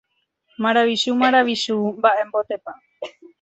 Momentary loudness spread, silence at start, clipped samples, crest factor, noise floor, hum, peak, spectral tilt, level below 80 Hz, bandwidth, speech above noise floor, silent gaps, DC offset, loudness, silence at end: 20 LU; 0.6 s; under 0.1%; 18 dB; -66 dBFS; none; -2 dBFS; -4 dB/octave; -68 dBFS; 8.2 kHz; 47 dB; none; under 0.1%; -19 LUFS; 0.3 s